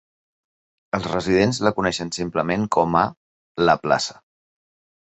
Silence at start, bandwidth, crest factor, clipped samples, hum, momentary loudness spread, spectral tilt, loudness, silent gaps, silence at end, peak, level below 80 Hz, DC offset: 0.95 s; 8.4 kHz; 20 dB; under 0.1%; none; 8 LU; -5 dB/octave; -21 LUFS; 3.17-3.55 s; 0.9 s; -2 dBFS; -50 dBFS; under 0.1%